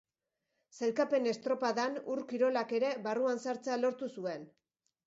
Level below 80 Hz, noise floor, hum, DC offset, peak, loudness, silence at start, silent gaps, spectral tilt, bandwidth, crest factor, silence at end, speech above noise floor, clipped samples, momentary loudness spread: -86 dBFS; -87 dBFS; none; under 0.1%; -18 dBFS; -34 LUFS; 0.75 s; none; -3 dB/octave; 7.6 kHz; 16 dB; 0.6 s; 54 dB; under 0.1%; 8 LU